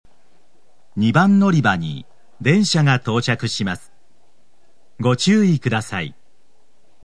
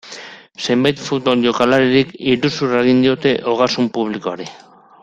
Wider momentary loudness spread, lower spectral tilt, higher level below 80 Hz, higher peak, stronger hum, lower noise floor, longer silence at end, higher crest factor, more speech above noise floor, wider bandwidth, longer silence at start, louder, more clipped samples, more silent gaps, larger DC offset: about the same, 14 LU vs 15 LU; about the same, -5.5 dB/octave vs -5.5 dB/octave; second, -60 dBFS vs -54 dBFS; about the same, 0 dBFS vs -2 dBFS; neither; first, -63 dBFS vs -36 dBFS; first, 0.95 s vs 0.45 s; about the same, 20 dB vs 16 dB; first, 47 dB vs 20 dB; first, 11 kHz vs 7.8 kHz; first, 0.95 s vs 0.05 s; about the same, -18 LUFS vs -16 LUFS; neither; neither; first, 1% vs under 0.1%